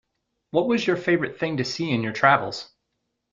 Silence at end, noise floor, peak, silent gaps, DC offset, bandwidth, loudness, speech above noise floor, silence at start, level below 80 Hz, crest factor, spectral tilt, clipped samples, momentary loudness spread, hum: 0.7 s; -78 dBFS; -2 dBFS; none; under 0.1%; 7.6 kHz; -23 LUFS; 55 dB; 0.55 s; -62 dBFS; 22 dB; -5.5 dB/octave; under 0.1%; 8 LU; none